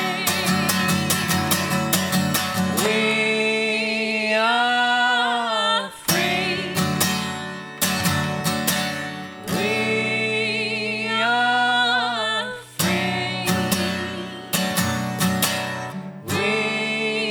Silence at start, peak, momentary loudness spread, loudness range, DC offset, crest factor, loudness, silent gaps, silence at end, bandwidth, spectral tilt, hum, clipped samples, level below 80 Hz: 0 s; -2 dBFS; 7 LU; 3 LU; under 0.1%; 20 dB; -21 LUFS; none; 0 s; over 20 kHz; -3.5 dB/octave; none; under 0.1%; -58 dBFS